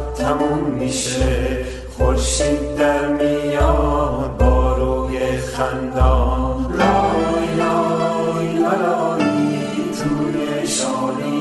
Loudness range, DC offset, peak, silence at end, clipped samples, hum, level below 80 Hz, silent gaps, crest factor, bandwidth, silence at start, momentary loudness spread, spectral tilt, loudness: 1 LU; under 0.1%; -2 dBFS; 0 s; under 0.1%; none; -24 dBFS; none; 16 dB; 12 kHz; 0 s; 5 LU; -5.5 dB/octave; -19 LUFS